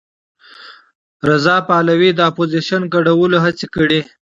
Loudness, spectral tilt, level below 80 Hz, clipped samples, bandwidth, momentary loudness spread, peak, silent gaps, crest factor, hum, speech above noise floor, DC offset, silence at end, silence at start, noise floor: -14 LUFS; -6.5 dB/octave; -52 dBFS; under 0.1%; 7.8 kHz; 5 LU; 0 dBFS; 0.95-1.20 s; 16 dB; none; 26 dB; under 0.1%; 0.2 s; 0.6 s; -40 dBFS